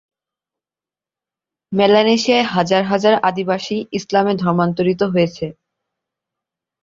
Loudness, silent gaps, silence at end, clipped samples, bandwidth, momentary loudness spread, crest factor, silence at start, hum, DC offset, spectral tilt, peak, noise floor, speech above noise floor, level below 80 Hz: -16 LUFS; none; 1.3 s; under 0.1%; 7.6 kHz; 9 LU; 18 dB; 1.7 s; none; under 0.1%; -5.5 dB/octave; -2 dBFS; under -90 dBFS; over 74 dB; -58 dBFS